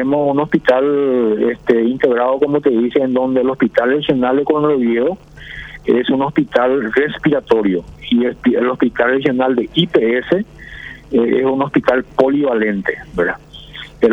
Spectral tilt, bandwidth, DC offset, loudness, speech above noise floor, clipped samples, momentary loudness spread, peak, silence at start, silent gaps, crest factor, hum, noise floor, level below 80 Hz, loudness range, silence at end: -7.5 dB/octave; 7 kHz; under 0.1%; -15 LUFS; 19 dB; under 0.1%; 7 LU; 0 dBFS; 0 s; none; 14 dB; none; -34 dBFS; -44 dBFS; 2 LU; 0 s